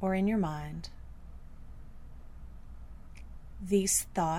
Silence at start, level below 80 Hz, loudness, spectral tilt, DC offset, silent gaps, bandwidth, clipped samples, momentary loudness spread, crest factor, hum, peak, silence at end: 0 s; -48 dBFS; -30 LUFS; -4.5 dB/octave; under 0.1%; none; 16 kHz; under 0.1%; 25 LU; 18 dB; none; -16 dBFS; 0 s